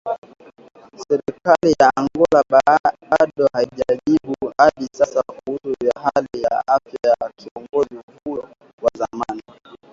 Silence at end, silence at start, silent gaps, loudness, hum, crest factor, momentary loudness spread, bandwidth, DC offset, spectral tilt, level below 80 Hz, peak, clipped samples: 0.5 s; 0.05 s; 0.18-0.22 s, 2.80-2.84 s, 7.51-7.55 s, 8.03-8.08 s, 8.73-8.78 s; -19 LUFS; none; 18 dB; 15 LU; 7.8 kHz; under 0.1%; -5.5 dB/octave; -54 dBFS; 0 dBFS; under 0.1%